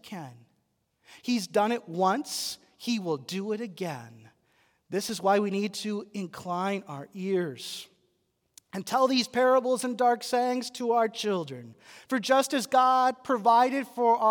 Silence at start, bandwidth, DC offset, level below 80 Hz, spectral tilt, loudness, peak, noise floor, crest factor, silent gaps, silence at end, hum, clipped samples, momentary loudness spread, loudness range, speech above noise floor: 0.05 s; 18 kHz; under 0.1%; -80 dBFS; -4 dB/octave; -27 LUFS; -10 dBFS; -75 dBFS; 18 dB; none; 0 s; none; under 0.1%; 15 LU; 7 LU; 47 dB